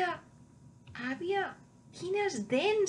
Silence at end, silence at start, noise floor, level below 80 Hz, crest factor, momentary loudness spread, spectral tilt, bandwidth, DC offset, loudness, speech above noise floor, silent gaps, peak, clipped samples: 0 s; 0 s; -57 dBFS; -72 dBFS; 16 dB; 18 LU; -4 dB/octave; 10.5 kHz; under 0.1%; -34 LUFS; 25 dB; none; -18 dBFS; under 0.1%